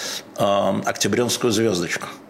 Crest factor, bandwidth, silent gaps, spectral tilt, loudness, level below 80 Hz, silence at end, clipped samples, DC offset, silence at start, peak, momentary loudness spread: 16 dB; 16.5 kHz; none; -3.5 dB/octave; -21 LUFS; -60 dBFS; 0 s; under 0.1%; under 0.1%; 0 s; -6 dBFS; 5 LU